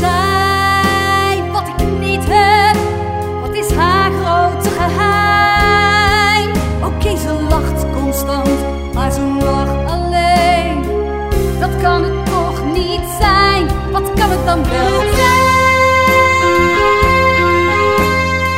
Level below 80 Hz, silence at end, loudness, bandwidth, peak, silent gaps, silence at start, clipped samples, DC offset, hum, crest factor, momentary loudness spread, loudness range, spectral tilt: -22 dBFS; 0 s; -13 LUFS; 16.5 kHz; 0 dBFS; none; 0 s; under 0.1%; under 0.1%; none; 12 dB; 8 LU; 5 LU; -5 dB/octave